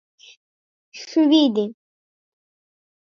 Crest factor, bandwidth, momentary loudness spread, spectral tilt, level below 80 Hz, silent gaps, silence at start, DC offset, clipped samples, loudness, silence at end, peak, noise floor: 20 dB; 7 kHz; 15 LU; -5 dB/octave; -80 dBFS; none; 0.95 s; under 0.1%; under 0.1%; -19 LUFS; 1.35 s; -4 dBFS; under -90 dBFS